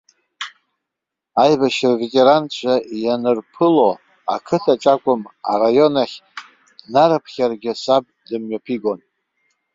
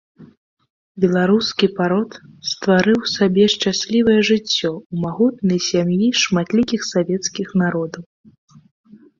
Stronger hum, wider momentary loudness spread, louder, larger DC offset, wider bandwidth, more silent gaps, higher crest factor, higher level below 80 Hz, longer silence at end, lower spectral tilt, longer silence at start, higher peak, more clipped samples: neither; first, 15 LU vs 10 LU; about the same, -17 LUFS vs -18 LUFS; neither; about the same, 7.8 kHz vs 7.6 kHz; second, none vs 0.37-0.57 s, 0.70-0.95 s, 4.85-4.90 s; about the same, 16 dB vs 16 dB; second, -64 dBFS vs -56 dBFS; second, 0.8 s vs 1.15 s; about the same, -5.5 dB/octave vs -5 dB/octave; first, 0.4 s vs 0.2 s; about the same, -2 dBFS vs -2 dBFS; neither